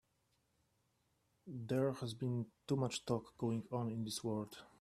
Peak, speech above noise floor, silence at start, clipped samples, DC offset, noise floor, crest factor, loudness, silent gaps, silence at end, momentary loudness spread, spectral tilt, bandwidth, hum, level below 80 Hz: -22 dBFS; 40 dB; 1.45 s; under 0.1%; under 0.1%; -80 dBFS; 20 dB; -41 LUFS; none; 0.15 s; 7 LU; -6 dB/octave; 14 kHz; none; -76 dBFS